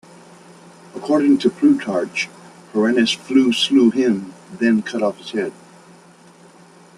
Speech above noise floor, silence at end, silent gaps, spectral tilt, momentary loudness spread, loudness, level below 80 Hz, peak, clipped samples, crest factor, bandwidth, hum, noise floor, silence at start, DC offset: 30 dB; 1.45 s; none; -4.5 dB/octave; 12 LU; -18 LUFS; -64 dBFS; -4 dBFS; under 0.1%; 16 dB; 11.5 kHz; none; -47 dBFS; 0.95 s; under 0.1%